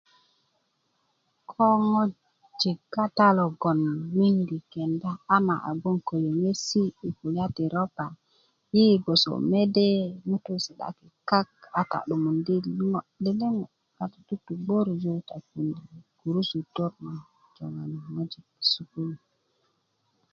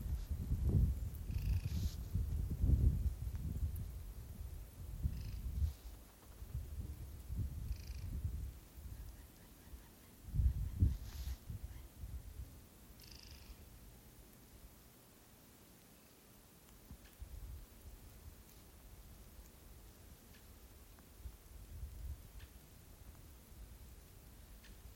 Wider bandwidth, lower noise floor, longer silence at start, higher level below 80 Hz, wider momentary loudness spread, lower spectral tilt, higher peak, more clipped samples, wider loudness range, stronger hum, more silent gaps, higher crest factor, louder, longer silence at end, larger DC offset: second, 7.6 kHz vs 16.5 kHz; first, -73 dBFS vs -63 dBFS; first, 1.5 s vs 0 s; second, -68 dBFS vs -46 dBFS; second, 15 LU vs 22 LU; about the same, -6 dB/octave vs -6.5 dB/octave; first, -6 dBFS vs -20 dBFS; neither; second, 7 LU vs 18 LU; neither; neither; about the same, 22 dB vs 22 dB; first, -26 LUFS vs -43 LUFS; first, 1.15 s vs 0 s; neither